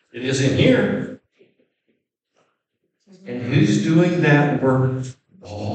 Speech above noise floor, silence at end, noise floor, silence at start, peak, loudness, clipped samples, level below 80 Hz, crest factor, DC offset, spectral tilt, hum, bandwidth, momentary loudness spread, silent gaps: 56 dB; 0 s; -74 dBFS; 0.15 s; -2 dBFS; -18 LUFS; under 0.1%; -58 dBFS; 18 dB; under 0.1%; -6.5 dB/octave; none; 9 kHz; 17 LU; none